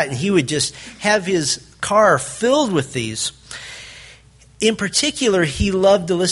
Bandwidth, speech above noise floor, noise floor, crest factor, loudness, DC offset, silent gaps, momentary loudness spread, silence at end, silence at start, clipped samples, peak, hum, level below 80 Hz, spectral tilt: 11.5 kHz; 29 dB; -47 dBFS; 18 dB; -18 LUFS; under 0.1%; none; 13 LU; 0 s; 0 s; under 0.1%; -2 dBFS; none; -40 dBFS; -3.5 dB/octave